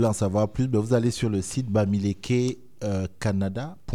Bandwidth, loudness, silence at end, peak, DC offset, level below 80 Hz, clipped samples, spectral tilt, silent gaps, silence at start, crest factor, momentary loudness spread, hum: 13 kHz; -26 LUFS; 0 s; -8 dBFS; 0.5%; -48 dBFS; under 0.1%; -6.5 dB/octave; none; 0 s; 16 dB; 7 LU; none